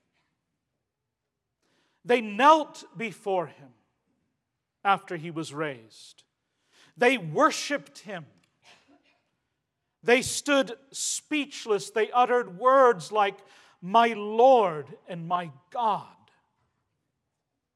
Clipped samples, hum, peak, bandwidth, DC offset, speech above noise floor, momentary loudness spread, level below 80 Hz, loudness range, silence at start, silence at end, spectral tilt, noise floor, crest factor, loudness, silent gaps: under 0.1%; none; -6 dBFS; 13.5 kHz; under 0.1%; 59 dB; 18 LU; -74 dBFS; 9 LU; 2.05 s; 1.7 s; -3.5 dB/octave; -84 dBFS; 22 dB; -25 LUFS; none